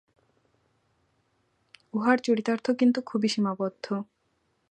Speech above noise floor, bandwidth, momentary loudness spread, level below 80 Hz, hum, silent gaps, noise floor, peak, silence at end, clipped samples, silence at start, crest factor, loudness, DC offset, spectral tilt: 47 dB; 9.2 kHz; 10 LU; -78 dBFS; none; none; -73 dBFS; -6 dBFS; 0.65 s; under 0.1%; 1.95 s; 22 dB; -27 LUFS; under 0.1%; -5.5 dB/octave